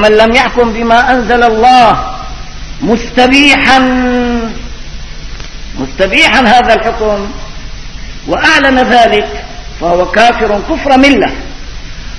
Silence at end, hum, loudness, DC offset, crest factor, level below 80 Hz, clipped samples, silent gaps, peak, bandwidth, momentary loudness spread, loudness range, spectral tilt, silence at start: 0 s; none; -7 LUFS; under 0.1%; 8 dB; -24 dBFS; 2%; none; 0 dBFS; 11 kHz; 22 LU; 3 LU; -4 dB/octave; 0 s